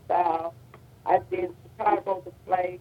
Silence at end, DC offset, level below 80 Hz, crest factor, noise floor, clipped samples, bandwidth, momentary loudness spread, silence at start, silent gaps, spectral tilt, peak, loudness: 0 s; under 0.1%; -62 dBFS; 20 dB; -50 dBFS; under 0.1%; 15.5 kHz; 10 LU; 0.1 s; none; -7.5 dB/octave; -8 dBFS; -28 LUFS